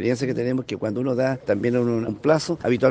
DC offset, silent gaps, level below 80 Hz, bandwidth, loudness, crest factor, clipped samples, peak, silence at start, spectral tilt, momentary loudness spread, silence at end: under 0.1%; none; -58 dBFS; 9.4 kHz; -23 LUFS; 16 dB; under 0.1%; -4 dBFS; 0 s; -6.5 dB/octave; 4 LU; 0 s